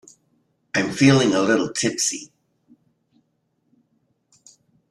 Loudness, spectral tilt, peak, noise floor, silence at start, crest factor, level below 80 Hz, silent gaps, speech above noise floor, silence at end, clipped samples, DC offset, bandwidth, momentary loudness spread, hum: -19 LUFS; -4 dB/octave; -2 dBFS; -70 dBFS; 0.75 s; 22 dB; -62 dBFS; none; 51 dB; 2.65 s; under 0.1%; under 0.1%; 12.5 kHz; 9 LU; none